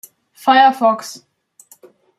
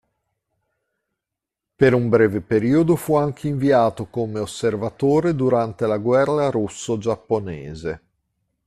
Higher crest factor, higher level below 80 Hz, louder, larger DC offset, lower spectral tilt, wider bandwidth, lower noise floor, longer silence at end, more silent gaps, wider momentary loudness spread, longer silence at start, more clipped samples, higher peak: about the same, 16 dB vs 18 dB; second, -70 dBFS vs -52 dBFS; first, -14 LUFS vs -20 LUFS; neither; second, -3 dB/octave vs -7 dB/octave; about the same, 14.5 kHz vs 14 kHz; second, -49 dBFS vs -85 dBFS; first, 1.05 s vs 0.7 s; neither; first, 14 LU vs 9 LU; second, 0.45 s vs 1.8 s; neither; about the same, -2 dBFS vs -2 dBFS